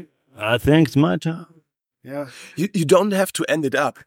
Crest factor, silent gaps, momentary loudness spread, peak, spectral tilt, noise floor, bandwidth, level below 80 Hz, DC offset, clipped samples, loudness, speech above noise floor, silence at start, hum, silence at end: 18 dB; none; 16 LU; -2 dBFS; -5.5 dB/octave; -60 dBFS; 17 kHz; -48 dBFS; under 0.1%; under 0.1%; -19 LUFS; 41 dB; 0 s; none; 0.15 s